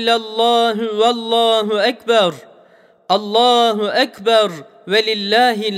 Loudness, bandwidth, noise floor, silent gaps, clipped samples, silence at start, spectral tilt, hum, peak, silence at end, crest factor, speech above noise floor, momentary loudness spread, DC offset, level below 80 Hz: -15 LUFS; 15 kHz; -49 dBFS; none; under 0.1%; 0 s; -3.5 dB/octave; none; -2 dBFS; 0 s; 14 dB; 34 dB; 5 LU; under 0.1%; -72 dBFS